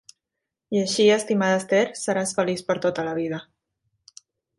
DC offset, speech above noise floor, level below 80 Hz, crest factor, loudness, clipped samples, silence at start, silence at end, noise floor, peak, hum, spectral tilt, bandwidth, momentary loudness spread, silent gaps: under 0.1%; 62 dB; -68 dBFS; 18 dB; -23 LUFS; under 0.1%; 0.7 s; 1.15 s; -84 dBFS; -6 dBFS; none; -4 dB/octave; 11.5 kHz; 9 LU; none